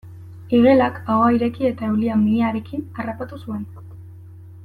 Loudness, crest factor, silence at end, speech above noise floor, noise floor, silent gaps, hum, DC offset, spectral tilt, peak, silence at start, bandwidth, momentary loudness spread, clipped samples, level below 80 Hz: -19 LUFS; 16 dB; 0 s; 21 dB; -40 dBFS; none; none; under 0.1%; -9 dB/octave; -4 dBFS; 0.05 s; 4.7 kHz; 22 LU; under 0.1%; -56 dBFS